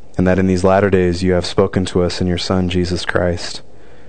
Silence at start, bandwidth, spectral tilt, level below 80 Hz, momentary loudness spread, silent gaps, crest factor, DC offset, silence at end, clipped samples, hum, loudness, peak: 0.15 s; 9.4 kHz; -6 dB/octave; -42 dBFS; 6 LU; none; 16 dB; 4%; 0.45 s; under 0.1%; none; -16 LUFS; 0 dBFS